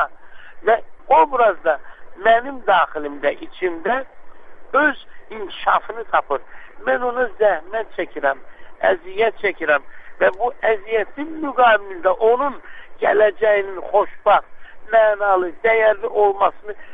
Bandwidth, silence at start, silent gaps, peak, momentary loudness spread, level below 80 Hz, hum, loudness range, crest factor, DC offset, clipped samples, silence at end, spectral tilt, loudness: 4.7 kHz; 0 s; none; -2 dBFS; 10 LU; -50 dBFS; none; 4 LU; 18 dB; under 0.1%; under 0.1%; 0 s; -6.5 dB/octave; -19 LUFS